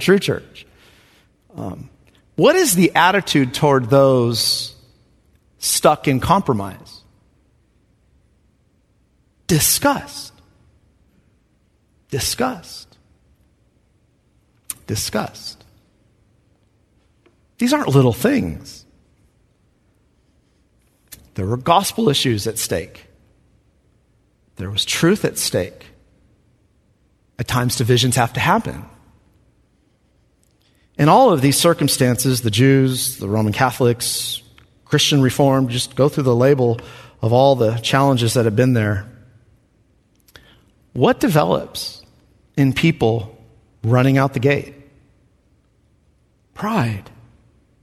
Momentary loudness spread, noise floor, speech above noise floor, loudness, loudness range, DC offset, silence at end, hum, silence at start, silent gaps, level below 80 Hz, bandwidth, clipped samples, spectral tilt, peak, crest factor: 18 LU; -60 dBFS; 44 dB; -17 LUFS; 12 LU; under 0.1%; 0.8 s; none; 0 s; none; -48 dBFS; 14 kHz; under 0.1%; -4.5 dB/octave; 0 dBFS; 20 dB